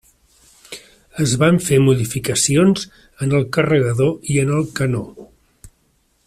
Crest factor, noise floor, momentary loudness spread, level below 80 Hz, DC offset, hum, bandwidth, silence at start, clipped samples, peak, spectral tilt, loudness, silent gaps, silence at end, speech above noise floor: 16 dB; -62 dBFS; 21 LU; -48 dBFS; under 0.1%; none; 15 kHz; 0.7 s; under 0.1%; -2 dBFS; -5.5 dB/octave; -17 LUFS; none; 0.6 s; 45 dB